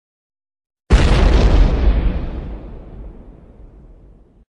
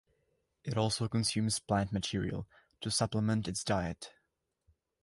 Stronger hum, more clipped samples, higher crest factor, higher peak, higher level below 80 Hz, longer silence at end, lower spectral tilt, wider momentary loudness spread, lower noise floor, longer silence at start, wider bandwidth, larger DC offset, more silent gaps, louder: neither; neither; about the same, 16 dB vs 18 dB; first, 0 dBFS vs -16 dBFS; first, -18 dBFS vs -56 dBFS; first, 1.15 s vs 0.95 s; first, -6.5 dB/octave vs -4.5 dB/octave; first, 23 LU vs 13 LU; second, -46 dBFS vs -82 dBFS; first, 0.9 s vs 0.65 s; second, 9.8 kHz vs 11.5 kHz; neither; neither; first, -16 LUFS vs -34 LUFS